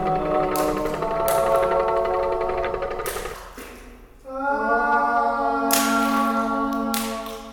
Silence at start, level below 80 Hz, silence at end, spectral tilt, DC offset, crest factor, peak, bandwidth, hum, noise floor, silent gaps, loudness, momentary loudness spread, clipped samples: 0 s; -42 dBFS; 0 s; -3.5 dB/octave; under 0.1%; 20 dB; -2 dBFS; over 20 kHz; none; -44 dBFS; none; -22 LUFS; 12 LU; under 0.1%